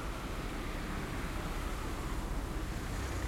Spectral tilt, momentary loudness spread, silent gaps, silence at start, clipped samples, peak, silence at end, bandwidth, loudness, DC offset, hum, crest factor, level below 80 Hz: -5 dB/octave; 1 LU; none; 0 s; under 0.1%; -24 dBFS; 0 s; 16.5 kHz; -40 LUFS; under 0.1%; none; 12 dB; -40 dBFS